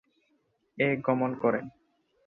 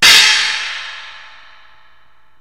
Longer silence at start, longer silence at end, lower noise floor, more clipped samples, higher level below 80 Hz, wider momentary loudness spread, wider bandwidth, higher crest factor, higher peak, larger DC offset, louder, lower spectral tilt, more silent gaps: first, 0.75 s vs 0 s; second, 0.55 s vs 1.25 s; first, -73 dBFS vs -54 dBFS; second, under 0.1% vs 0.3%; second, -70 dBFS vs -50 dBFS; second, 7 LU vs 25 LU; second, 4.2 kHz vs over 20 kHz; about the same, 20 dB vs 16 dB; second, -12 dBFS vs 0 dBFS; second, under 0.1% vs 0.9%; second, -28 LUFS vs -10 LUFS; first, -9.5 dB/octave vs 2 dB/octave; neither